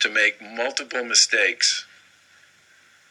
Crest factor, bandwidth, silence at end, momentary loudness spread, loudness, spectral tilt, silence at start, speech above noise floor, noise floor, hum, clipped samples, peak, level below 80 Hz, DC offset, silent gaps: 20 dB; 13.5 kHz; 1.25 s; 11 LU; -20 LUFS; 2 dB/octave; 0 s; 34 dB; -56 dBFS; none; under 0.1%; -4 dBFS; -86 dBFS; under 0.1%; none